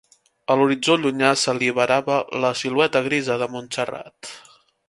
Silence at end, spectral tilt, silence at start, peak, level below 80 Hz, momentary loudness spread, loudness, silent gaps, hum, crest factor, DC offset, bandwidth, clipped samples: 0.5 s; -4 dB/octave; 0.5 s; -2 dBFS; -66 dBFS; 16 LU; -20 LUFS; none; none; 20 dB; under 0.1%; 11.5 kHz; under 0.1%